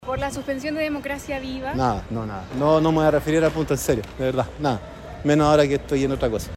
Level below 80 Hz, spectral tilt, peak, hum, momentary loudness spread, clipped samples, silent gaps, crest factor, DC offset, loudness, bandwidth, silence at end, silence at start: -40 dBFS; -6 dB/octave; -4 dBFS; none; 11 LU; under 0.1%; none; 18 dB; under 0.1%; -22 LUFS; 16 kHz; 0 s; 0 s